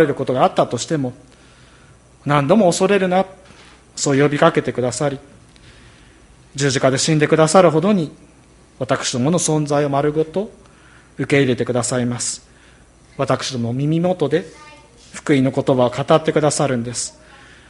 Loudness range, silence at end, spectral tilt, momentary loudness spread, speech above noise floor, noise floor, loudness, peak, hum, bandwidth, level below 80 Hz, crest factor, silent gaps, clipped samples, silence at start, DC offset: 4 LU; 0.6 s; -5 dB/octave; 13 LU; 31 dB; -48 dBFS; -17 LUFS; 0 dBFS; none; 11.5 kHz; -52 dBFS; 18 dB; none; under 0.1%; 0 s; under 0.1%